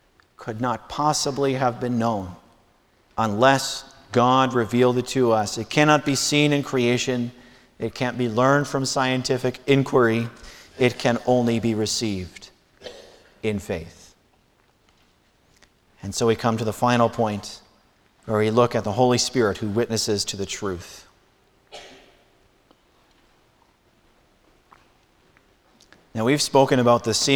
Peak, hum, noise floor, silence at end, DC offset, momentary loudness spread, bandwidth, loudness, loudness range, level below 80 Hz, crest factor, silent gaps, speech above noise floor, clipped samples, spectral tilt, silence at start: -2 dBFS; none; -61 dBFS; 0 s; under 0.1%; 17 LU; 19 kHz; -22 LUFS; 11 LU; -54 dBFS; 20 dB; none; 40 dB; under 0.1%; -4.5 dB/octave; 0.4 s